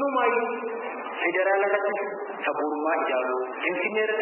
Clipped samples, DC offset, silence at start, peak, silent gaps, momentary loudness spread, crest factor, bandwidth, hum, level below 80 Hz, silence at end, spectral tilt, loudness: under 0.1%; under 0.1%; 0 s; -10 dBFS; none; 9 LU; 16 dB; 3.3 kHz; none; under -90 dBFS; 0 s; -8 dB/octave; -26 LUFS